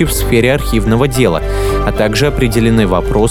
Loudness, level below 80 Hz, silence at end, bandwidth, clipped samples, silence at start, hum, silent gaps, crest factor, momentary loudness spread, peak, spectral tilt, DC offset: -12 LUFS; -20 dBFS; 0 s; 18.5 kHz; under 0.1%; 0 s; none; none; 12 dB; 4 LU; 0 dBFS; -5.5 dB/octave; under 0.1%